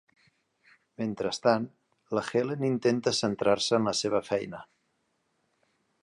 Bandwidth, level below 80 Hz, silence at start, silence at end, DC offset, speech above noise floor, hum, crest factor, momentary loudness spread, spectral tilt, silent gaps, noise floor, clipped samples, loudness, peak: 11.5 kHz; -68 dBFS; 1 s; 1.4 s; under 0.1%; 47 dB; none; 22 dB; 10 LU; -4.5 dB/octave; none; -75 dBFS; under 0.1%; -28 LUFS; -8 dBFS